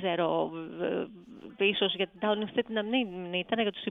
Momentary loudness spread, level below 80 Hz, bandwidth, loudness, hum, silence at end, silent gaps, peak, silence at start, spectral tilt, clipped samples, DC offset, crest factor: 8 LU; -70 dBFS; 4 kHz; -30 LUFS; none; 0 s; none; -14 dBFS; 0 s; -7.5 dB/octave; under 0.1%; under 0.1%; 18 dB